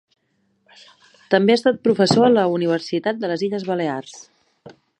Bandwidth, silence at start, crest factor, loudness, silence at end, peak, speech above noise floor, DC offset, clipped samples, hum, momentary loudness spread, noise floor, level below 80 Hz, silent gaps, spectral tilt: 10.5 kHz; 1.3 s; 20 dB; -19 LUFS; 0.3 s; 0 dBFS; 48 dB; under 0.1%; under 0.1%; none; 9 LU; -67 dBFS; -64 dBFS; none; -5.5 dB/octave